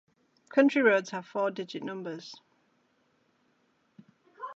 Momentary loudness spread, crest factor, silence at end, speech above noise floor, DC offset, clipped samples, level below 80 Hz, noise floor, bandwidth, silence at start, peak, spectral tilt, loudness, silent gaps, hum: 20 LU; 22 dB; 0 s; 43 dB; under 0.1%; under 0.1%; -88 dBFS; -71 dBFS; 7.6 kHz; 0.55 s; -8 dBFS; -5.5 dB/octave; -28 LUFS; none; none